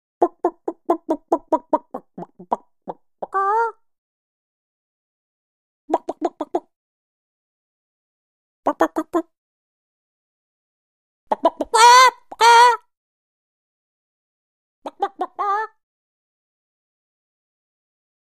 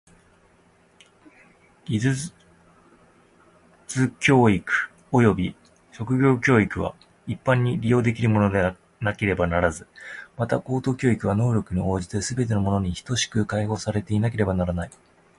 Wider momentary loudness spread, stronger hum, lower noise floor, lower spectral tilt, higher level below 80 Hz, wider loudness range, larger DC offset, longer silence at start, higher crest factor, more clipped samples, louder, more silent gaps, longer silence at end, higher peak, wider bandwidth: first, 24 LU vs 12 LU; neither; second, -39 dBFS vs -58 dBFS; second, -1 dB/octave vs -6 dB/octave; second, -66 dBFS vs -44 dBFS; first, 15 LU vs 8 LU; neither; second, 0.2 s vs 1.9 s; about the same, 22 dB vs 18 dB; neither; first, -18 LUFS vs -23 LUFS; first, 3.98-5.88 s, 6.76-8.63 s, 9.38-11.27 s, 12.97-14.82 s vs none; first, 2.7 s vs 0.5 s; first, 0 dBFS vs -4 dBFS; first, 15 kHz vs 11.5 kHz